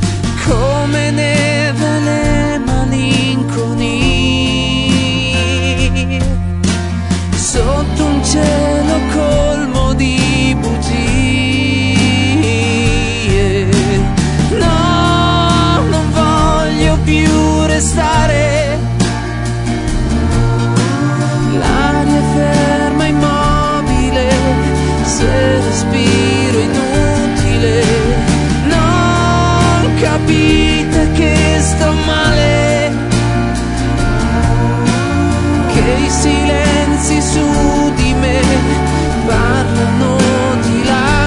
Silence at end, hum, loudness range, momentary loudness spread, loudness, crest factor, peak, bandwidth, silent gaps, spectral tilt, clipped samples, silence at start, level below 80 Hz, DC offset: 0 s; none; 2 LU; 4 LU; -12 LUFS; 12 dB; 0 dBFS; 11 kHz; none; -5 dB/octave; under 0.1%; 0 s; -20 dBFS; under 0.1%